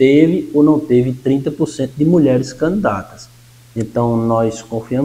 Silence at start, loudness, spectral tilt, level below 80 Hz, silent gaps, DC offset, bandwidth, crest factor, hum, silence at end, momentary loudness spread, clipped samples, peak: 0 s; -15 LUFS; -7.5 dB/octave; -46 dBFS; none; under 0.1%; 13 kHz; 14 dB; none; 0 s; 12 LU; under 0.1%; 0 dBFS